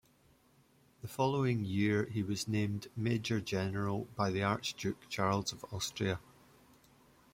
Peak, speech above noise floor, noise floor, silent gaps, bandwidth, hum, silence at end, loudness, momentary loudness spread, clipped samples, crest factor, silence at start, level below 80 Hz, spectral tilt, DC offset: -18 dBFS; 33 dB; -68 dBFS; none; 16.5 kHz; none; 1.15 s; -35 LUFS; 7 LU; under 0.1%; 18 dB; 1.05 s; -66 dBFS; -5.5 dB/octave; under 0.1%